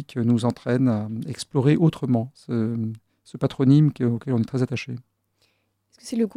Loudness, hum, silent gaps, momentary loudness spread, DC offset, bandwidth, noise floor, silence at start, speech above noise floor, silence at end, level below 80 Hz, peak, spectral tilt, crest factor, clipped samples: -23 LUFS; none; none; 14 LU; under 0.1%; 11.5 kHz; -68 dBFS; 0 s; 46 dB; 0.05 s; -60 dBFS; -6 dBFS; -8 dB/octave; 18 dB; under 0.1%